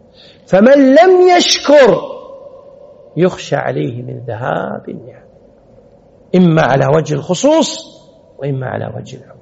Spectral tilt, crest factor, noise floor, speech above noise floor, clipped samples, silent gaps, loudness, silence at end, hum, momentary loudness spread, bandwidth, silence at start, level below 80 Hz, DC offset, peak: -4.5 dB/octave; 12 dB; -44 dBFS; 33 dB; under 0.1%; none; -11 LUFS; 0.25 s; none; 20 LU; 8 kHz; 0.5 s; -52 dBFS; under 0.1%; 0 dBFS